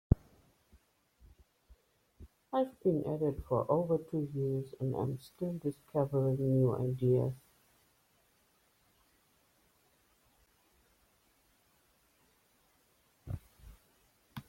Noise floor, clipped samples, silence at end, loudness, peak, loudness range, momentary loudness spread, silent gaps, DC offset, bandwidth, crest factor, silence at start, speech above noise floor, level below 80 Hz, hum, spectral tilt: -72 dBFS; under 0.1%; 0.05 s; -34 LUFS; -12 dBFS; 21 LU; 15 LU; none; under 0.1%; 16 kHz; 26 dB; 0.1 s; 39 dB; -54 dBFS; none; -10 dB/octave